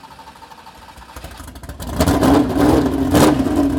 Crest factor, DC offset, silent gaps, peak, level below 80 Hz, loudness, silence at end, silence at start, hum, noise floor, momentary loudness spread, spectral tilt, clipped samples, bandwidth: 14 dB; under 0.1%; none; -4 dBFS; -30 dBFS; -15 LUFS; 0 s; 0.05 s; none; -40 dBFS; 22 LU; -6 dB/octave; under 0.1%; 18 kHz